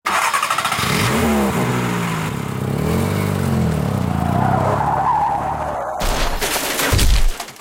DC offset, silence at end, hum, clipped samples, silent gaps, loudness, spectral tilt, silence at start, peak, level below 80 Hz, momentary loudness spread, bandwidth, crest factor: under 0.1%; 0 s; none; under 0.1%; none; -19 LUFS; -4.5 dB/octave; 0.05 s; -4 dBFS; -26 dBFS; 6 LU; 17 kHz; 12 dB